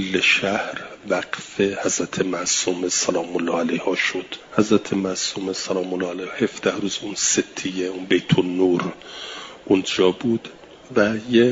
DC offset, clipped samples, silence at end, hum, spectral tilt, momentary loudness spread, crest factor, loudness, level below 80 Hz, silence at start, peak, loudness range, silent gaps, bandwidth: under 0.1%; under 0.1%; 0 s; none; -3.5 dB/octave; 9 LU; 20 dB; -22 LUFS; -60 dBFS; 0 s; -2 dBFS; 2 LU; none; 7.8 kHz